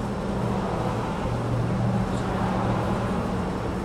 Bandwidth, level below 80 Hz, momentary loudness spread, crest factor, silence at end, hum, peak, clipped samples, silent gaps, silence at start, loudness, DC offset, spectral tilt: 12.5 kHz; -38 dBFS; 3 LU; 14 dB; 0 s; none; -12 dBFS; under 0.1%; none; 0 s; -26 LUFS; under 0.1%; -7.5 dB/octave